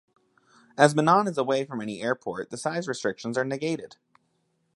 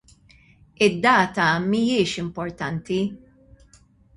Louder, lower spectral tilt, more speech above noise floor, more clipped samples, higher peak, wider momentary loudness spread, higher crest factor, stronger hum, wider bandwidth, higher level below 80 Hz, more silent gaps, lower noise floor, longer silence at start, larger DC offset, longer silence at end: second, -26 LUFS vs -22 LUFS; about the same, -5 dB/octave vs -5 dB/octave; first, 47 dB vs 34 dB; neither; about the same, -2 dBFS vs -4 dBFS; about the same, 13 LU vs 12 LU; first, 26 dB vs 20 dB; neither; about the same, 11.5 kHz vs 11.5 kHz; second, -72 dBFS vs -56 dBFS; neither; first, -72 dBFS vs -55 dBFS; about the same, 0.75 s vs 0.8 s; neither; about the same, 0.9 s vs 1 s